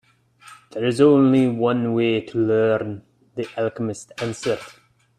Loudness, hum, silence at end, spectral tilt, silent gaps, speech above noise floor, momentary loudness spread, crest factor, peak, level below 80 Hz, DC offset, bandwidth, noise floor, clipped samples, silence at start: -20 LUFS; none; 0.45 s; -6.5 dB/octave; none; 30 dB; 16 LU; 18 dB; -4 dBFS; -62 dBFS; under 0.1%; 11.5 kHz; -50 dBFS; under 0.1%; 0.45 s